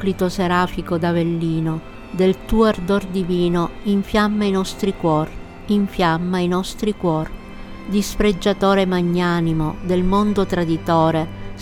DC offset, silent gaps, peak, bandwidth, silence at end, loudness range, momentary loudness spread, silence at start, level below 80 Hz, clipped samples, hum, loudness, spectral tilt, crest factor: under 0.1%; none; -4 dBFS; 16 kHz; 0 s; 2 LU; 7 LU; 0 s; -34 dBFS; under 0.1%; none; -19 LUFS; -6.5 dB/octave; 14 dB